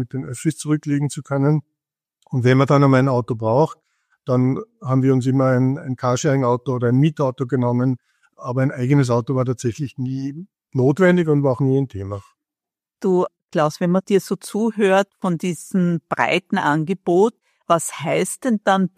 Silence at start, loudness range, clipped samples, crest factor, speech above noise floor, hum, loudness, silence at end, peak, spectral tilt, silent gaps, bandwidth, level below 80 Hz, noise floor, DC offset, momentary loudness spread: 0 s; 2 LU; under 0.1%; 18 dB; 70 dB; none; -19 LUFS; 0.1 s; -2 dBFS; -7 dB/octave; 13.44-13.48 s; 14.5 kHz; -60 dBFS; -89 dBFS; under 0.1%; 10 LU